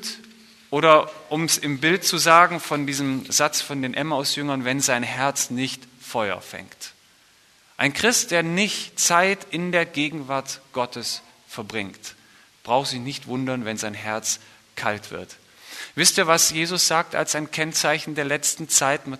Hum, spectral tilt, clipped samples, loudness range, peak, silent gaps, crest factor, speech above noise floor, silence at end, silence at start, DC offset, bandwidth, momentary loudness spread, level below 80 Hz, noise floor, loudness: none; -2.5 dB/octave; under 0.1%; 8 LU; 0 dBFS; none; 24 dB; 34 dB; 0 s; 0 s; under 0.1%; 13.5 kHz; 16 LU; -66 dBFS; -56 dBFS; -21 LUFS